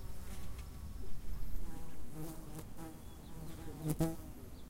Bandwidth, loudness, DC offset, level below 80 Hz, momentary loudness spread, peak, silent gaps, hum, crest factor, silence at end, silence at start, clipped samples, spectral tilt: 16 kHz; -46 LUFS; under 0.1%; -48 dBFS; 13 LU; -20 dBFS; none; none; 18 dB; 0 s; 0 s; under 0.1%; -6.5 dB/octave